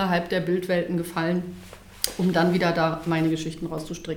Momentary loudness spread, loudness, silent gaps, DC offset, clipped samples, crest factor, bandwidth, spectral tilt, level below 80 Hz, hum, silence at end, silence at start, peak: 11 LU; -25 LUFS; none; under 0.1%; under 0.1%; 24 dB; over 20 kHz; -5.5 dB/octave; -52 dBFS; none; 0 s; 0 s; -2 dBFS